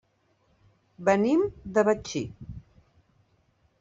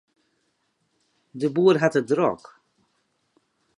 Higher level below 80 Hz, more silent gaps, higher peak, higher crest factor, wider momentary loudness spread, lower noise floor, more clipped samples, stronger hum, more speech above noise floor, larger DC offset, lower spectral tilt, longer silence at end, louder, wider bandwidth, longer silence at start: first, -56 dBFS vs -72 dBFS; neither; second, -8 dBFS vs -4 dBFS; about the same, 20 dB vs 22 dB; first, 22 LU vs 17 LU; second, -68 dBFS vs -72 dBFS; neither; neither; second, 43 dB vs 51 dB; neither; about the same, -6 dB/octave vs -6.5 dB/octave; second, 1.2 s vs 1.4 s; second, -26 LUFS vs -22 LUFS; second, 8 kHz vs 10.5 kHz; second, 1 s vs 1.35 s